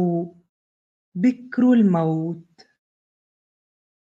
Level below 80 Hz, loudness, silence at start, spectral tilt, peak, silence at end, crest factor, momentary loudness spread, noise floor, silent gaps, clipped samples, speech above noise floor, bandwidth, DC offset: -74 dBFS; -20 LUFS; 0 s; -9.5 dB/octave; -8 dBFS; 1.7 s; 16 dB; 19 LU; under -90 dBFS; 0.49-1.12 s; under 0.1%; over 71 dB; 7.4 kHz; under 0.1%